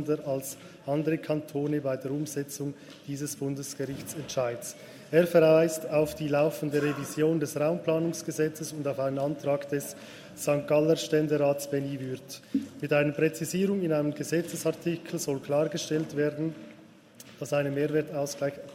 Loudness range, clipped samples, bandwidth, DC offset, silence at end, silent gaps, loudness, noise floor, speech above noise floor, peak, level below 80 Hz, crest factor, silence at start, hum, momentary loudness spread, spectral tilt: 6 LU; under 0.1%; 16 kHz; under 0.1%; 0 s; none; -29 LUFS; -53 dBFS; 24 dB; -10 dBFS; -68 dBFS; 20 dB; 0 s; none; 11 LU; -5.5 dB/octave